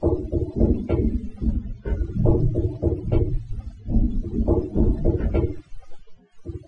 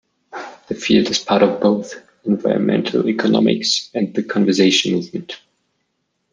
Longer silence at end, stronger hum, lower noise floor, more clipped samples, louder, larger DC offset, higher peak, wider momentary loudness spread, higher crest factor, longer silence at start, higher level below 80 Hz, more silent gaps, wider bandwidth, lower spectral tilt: second, 0.05 s vs 0.95 s; neither; second, -42 dBFS vs -71 dBFS; neither; second, -24 LUFS vs -17 LUFS; neither; about the same, -4 dBFS vs -2 dBFS; second, 9 LU vs 19 LU; about the same, 20 dB vs 16 dB; second, 0 s vs 0.35 s; first, -26 dBFS vs -60 dBFS; neither; second, 4.5 kHz vs 9.8 kHz; first, -11.5 dB/octave vs -4.5 dB/octave